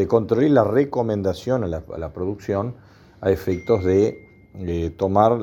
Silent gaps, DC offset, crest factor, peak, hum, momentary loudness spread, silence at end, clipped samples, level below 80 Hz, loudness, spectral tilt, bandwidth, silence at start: none; under 0.1%; 20 dB; -2 dBFS; none; 11 LU; 0 s; under 0.1%; -48 dBFS; -21 LUFS; -8 dB/octave; 17.5 kHz; 0 s